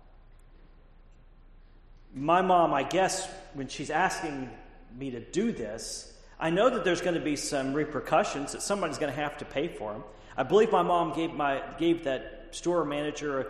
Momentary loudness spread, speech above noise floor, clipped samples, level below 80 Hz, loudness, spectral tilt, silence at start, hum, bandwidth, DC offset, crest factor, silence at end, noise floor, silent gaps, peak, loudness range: 15 LU; 25 dB; under 0.1%; -52 dBFS; -29 LUFS; -4.5 dB/octave; 0.1 s; none; 13 kHz; under 0.1%; 20 dB; 0 s; -54 dBFS; none; -10 dBFS; 3 LU